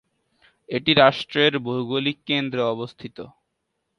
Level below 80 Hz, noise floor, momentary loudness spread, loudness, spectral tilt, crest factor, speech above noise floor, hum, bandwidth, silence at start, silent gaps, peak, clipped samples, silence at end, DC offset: -60 dBFS; -77 dBFS; 19 LU; -21 LUFS; -6 dB/octave; 22 dB; 55 dB; none; 10.5 kHz; 0.7 s; none; -2 dBFS; under 0.1%; 0.7 s; under 0.1%